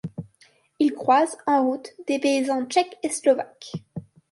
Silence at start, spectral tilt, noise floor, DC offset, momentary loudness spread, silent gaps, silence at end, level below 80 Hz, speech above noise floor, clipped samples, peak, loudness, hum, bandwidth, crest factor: 0.05 s; -4.5 dB/octave; -59 dBFS; under 0.1%; 17 LU; none; 0.3 s; -68 dBFS; 37 dB; under 0.1%; -6 dBFS; -23 LUFS; none; 11.5 kHz; 18 dB